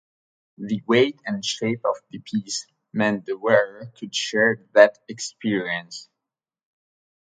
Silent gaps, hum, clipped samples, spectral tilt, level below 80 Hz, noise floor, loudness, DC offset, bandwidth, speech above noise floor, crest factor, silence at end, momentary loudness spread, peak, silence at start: none; none; under 0.1%; -4 dB/octave; -70 dBFS; -88 dBFS; -23 LUFS; under 0.1%; 9.4 kHz; 65 dB; 24 dB; 1.25 s; 15 LU; 0 dBFS; 0.6 s